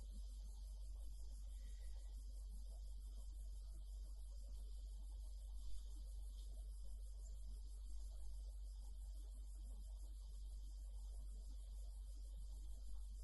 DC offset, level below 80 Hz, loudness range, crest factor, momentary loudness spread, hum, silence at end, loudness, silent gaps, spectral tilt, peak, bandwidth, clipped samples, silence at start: under 0.1%; -52 dBFS; 0 LU; 12 dB; 1 LU; none; 0 s; -56 LUFS; none; -5 dB/octave; -38 dBFS; 12 kHz; under 0.1%; 0 s